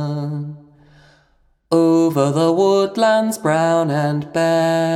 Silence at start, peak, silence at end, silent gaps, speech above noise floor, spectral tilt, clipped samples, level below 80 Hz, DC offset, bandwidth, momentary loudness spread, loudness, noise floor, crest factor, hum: 0 s; -2 dBFS; 0 s; none; 42 dB; -6 dB/octave; under 0.1%; -62 dBFS; under 0.1%; 15.5 kHz; 9 LU; -17 LUFS; -59 dBFS; 14 dB; none